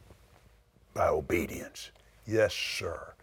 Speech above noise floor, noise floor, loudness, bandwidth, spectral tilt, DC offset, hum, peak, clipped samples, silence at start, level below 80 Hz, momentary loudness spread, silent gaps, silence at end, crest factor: 31 dB; -62 dBFS; -31 LUFS; over 20 kHz; -4.5 dB/octave; under 0.1%; none; -14 dBFS; under 0.1%; 0.1 s; -56 dBFS; 17 LU; none; 0.1 s; 20 dB